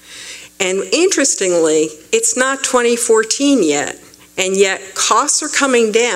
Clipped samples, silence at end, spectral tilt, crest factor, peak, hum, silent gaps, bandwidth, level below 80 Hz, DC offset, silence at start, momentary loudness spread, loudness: under 0.1%; 0 s; -1.5 dB/octave; 14 dB; 0 dBFS; none; none; 16 kHz; -60 dBFS; under 0.1%; 0.1 s; 9 LU; -14 LUFS